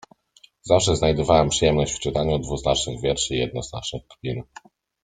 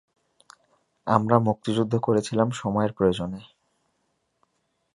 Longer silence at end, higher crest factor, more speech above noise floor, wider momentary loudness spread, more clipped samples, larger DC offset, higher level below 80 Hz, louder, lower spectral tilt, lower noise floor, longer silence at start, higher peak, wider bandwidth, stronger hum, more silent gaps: second, 0.6 s vs 1.5 s; about the same, 20 dB vs 24 dB; second, 34 dB vs 51 dB; about the same, 13 LU vs 11 LU; neither; neither; first, -40 dBFS vs -56 dBFS; about the same, -22 LUFS vs -24 LUFS; second, -4.5 dB/octave vs -7 dB/octave; second, -56 dBFS vs -74 dBFS; second, 0.65 s vs 1.05 s; about the same, -2 dBFS vs -2 dBFS; second, 9.6 kHz vs 11.5 kHz; neither; neither